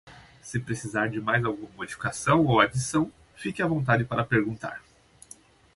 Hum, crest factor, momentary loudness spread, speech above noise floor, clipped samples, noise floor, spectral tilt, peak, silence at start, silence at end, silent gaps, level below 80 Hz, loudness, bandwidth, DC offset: none; 22 dB; 15 LU; 27 dB; under 0.1%; -53 dBFS; -5.5 dB/octave; -4 dBFS; 0.05 s; 0.95 s; none; -54 dBFS; -26 LUFS; 11.5 kHz; under 0.1%